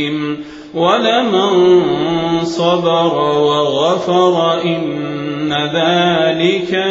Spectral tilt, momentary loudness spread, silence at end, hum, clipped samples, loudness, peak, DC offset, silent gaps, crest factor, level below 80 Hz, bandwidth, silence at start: -5.5 dB/octave; 9 LU; 0 s; none; under 0.1%; -14 LUFS; 0 dBFS; under 0.1%; none; 14 dB; -52 dBFS; 7.8 kHz; 0 s